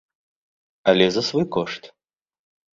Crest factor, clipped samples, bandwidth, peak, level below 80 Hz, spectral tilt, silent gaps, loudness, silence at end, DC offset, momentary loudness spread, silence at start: 22 dB; under 0.1%; 7.8 kHz; -2 dBFS; -60 dBFS; -5 dB/octave; none; -21 LUFS; 0.85 s; under 0.1%; 12 LU; 0.85 s